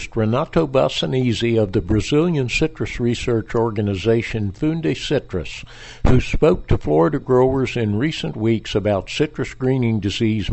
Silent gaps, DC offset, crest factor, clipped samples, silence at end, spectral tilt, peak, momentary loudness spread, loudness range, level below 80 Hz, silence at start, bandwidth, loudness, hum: none; under 0.1%; 18 dB; under 0.1%; 0 s; -6.5 dB/octave; -2 dBFS; 6 LU; 2 LU; -32 dBFS; 0 s; 8.4 kHz; -20 LUFS; none